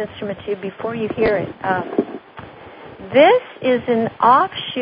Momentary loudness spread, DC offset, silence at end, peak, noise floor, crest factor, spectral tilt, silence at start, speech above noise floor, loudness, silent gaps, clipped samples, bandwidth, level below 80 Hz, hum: 24 LU; under 0.1%; 0 s; 0 dBFS; -38 dBFS; 18 dB; -10.5 dB/octave; 0 s; 21 dB; -18 LUFS; none; under 0.1%; 5.2 kHz; -52 dBFS; none